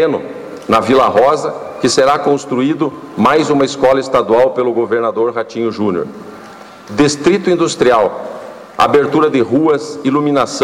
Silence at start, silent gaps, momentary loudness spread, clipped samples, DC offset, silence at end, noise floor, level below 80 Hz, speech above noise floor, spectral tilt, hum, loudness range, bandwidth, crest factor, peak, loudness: 0 s; none; 12 LU; under 0.1%; under 0.1%; 0 s; -34 dBFS; -50 dBFS; 22 dB; -5 dB/octave; none; 3 LU; 14 kHz; 10 dB; -2 dBFS; -13 LUFS